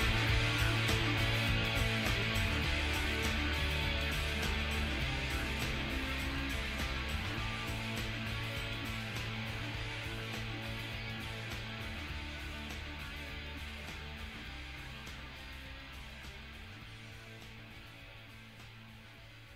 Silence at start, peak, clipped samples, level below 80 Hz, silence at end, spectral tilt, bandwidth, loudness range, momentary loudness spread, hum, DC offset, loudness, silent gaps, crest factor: 0 s; -16 dBFS; under 0.1%; -44 dBFS; 0 s; -4.5 dB/octave; 16 kHz; 15 LU; 18 LU; none; under 0.1%; -36 LUFS; none; 20 dB